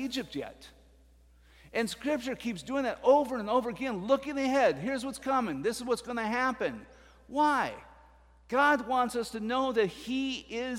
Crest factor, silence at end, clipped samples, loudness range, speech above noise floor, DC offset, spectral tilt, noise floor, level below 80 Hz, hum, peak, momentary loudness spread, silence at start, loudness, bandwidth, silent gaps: 18 dB; 0 s; under 0.1%; 3 LU; 30 dB; under 0.1%; -4.5 dB/octave; -60 dBFS; -60 dBFS; none; -12 dBFS; 10 LU; 0 s; -30 LUFS; 16 kHz; none